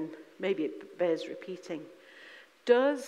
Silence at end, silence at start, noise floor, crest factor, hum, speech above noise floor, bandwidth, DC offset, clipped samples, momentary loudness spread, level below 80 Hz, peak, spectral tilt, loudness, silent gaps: 0 s; 0 s; -54 dBFS; 22 dB; none; 22 dB; 11.5 kHz; under 0.1%; under 0.1%; 24 LU; under -90 dBFS; -10 dBFS; -5 dB/octave; -32 LUFS; none